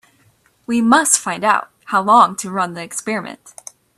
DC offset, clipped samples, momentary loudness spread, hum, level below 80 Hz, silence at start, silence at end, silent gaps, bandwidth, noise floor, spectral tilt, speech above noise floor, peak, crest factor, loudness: under 0.1%; under 0.1%; 20 LU; none; -64 dBFS; 0.7 s; 0.45 s; none; 14.5 kHz; -57 dBFS; -2.5 dB/octave; 40 dB; 0 dBFS; 18 dB; -16 LUFS